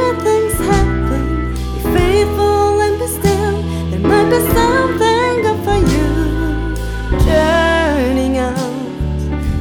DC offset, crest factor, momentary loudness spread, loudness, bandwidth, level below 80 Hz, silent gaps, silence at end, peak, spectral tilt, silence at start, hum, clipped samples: under 0.1%; 14 dB; 8 LU; -15 LUFS; 19 kHz; -22 dBFS; none; 0 s; 0 dBFS; -6 dB/octave; 0 s; none; under 0.1%